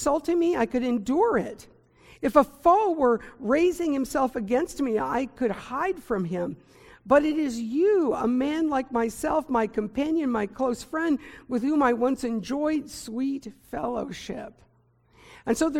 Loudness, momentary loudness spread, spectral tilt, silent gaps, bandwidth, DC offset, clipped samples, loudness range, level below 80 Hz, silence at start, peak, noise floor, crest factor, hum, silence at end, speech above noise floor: -26 LUFS; 10 LU; -5.5 dB/octave; none; 16.5 kHz; under 0.1%; under 0.1%; 4 LU; -54 dBFS; 0 s; -6 dBFS; -62 dBFS; 20 dB; none; 0 s; 37 dB